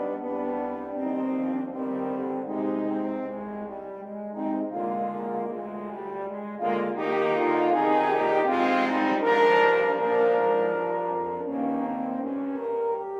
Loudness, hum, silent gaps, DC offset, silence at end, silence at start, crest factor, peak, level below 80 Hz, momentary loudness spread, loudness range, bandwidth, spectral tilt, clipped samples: -26 LUFS; none; none; under 0.1%; 0 s; 0 s; 18 dB; -8 dBFS; -70 dBFS; 12 LU; 9 LU; 7.6 kHz; -6.5 dB/octave; under 0.1%